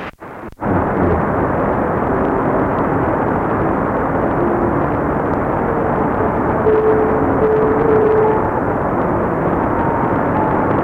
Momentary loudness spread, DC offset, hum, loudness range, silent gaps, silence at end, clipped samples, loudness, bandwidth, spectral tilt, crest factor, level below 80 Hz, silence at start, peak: 4 LU; under 0.1%; none; 2 LU; none; 0 s; under 0.1%; -16 LUFS; 4.5 kHz; -10 dB/octave; 12 dB; -32 dBFS; 0 s; -2 dBFS